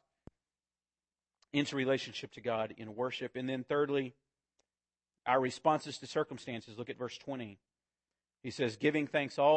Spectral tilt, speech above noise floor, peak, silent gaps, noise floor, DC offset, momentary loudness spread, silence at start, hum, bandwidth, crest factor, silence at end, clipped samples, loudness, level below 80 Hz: -5.5 dB/octave; over 56 dB; -16 dBFS; none; under -90 dBFS; under 0.1%; 12 LU; 1.55 s; none; 8.4 kHz; 22 dB; 0 s; under 0.1%; -36 LUFS; -76 dBFS